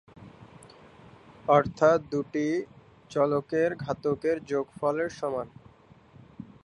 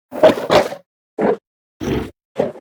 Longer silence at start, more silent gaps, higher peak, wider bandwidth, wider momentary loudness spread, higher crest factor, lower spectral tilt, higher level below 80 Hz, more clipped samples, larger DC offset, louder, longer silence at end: about the same, 0.2 s vs 0.1 s; second, none vs 0.86-1.17 s, 1.47-1.80 s, 2.25-2.35 s; second, -8 dBFS vs 0 dBFS; second, 11 kHz vs over 20 kHz; about the same, 14 LU vs 16 LU; about the same, 22 dB vs 18 dB; first, -7 dB/octave vs -5.5 dB/octave; second, -62 dBFS vs -42 dBFS; neither; neither; second, -27 LUFS vs -18 LUFS; first, 0.2 s vs 0 s